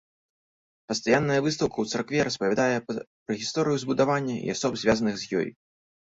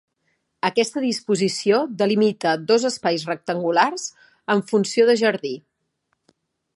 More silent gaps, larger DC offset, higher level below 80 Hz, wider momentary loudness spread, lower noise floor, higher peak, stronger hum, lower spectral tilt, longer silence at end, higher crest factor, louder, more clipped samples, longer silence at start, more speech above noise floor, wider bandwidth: first, 3.07-3.26 s vs none; neither; first, -58 dBFS vs -74 dBFS; about the same, 8 LU vs 10 LU; first, under -90 dBFS vs -73 dBFS; second, -8 dBFS vs -2 dBFS; neither; about the same, -4.5 dB/octave vs -4.5 dB/octave; second, 0.6 s vs 1.15 s; about the same, 18 dB vs 20 dB; second, -26 LUFS vs -21 LUFS; neither; first, 0.9 s vs 0.65 s; first, over 64 dB vs 53 dB; second, 8 kHz vs 11.5 kHz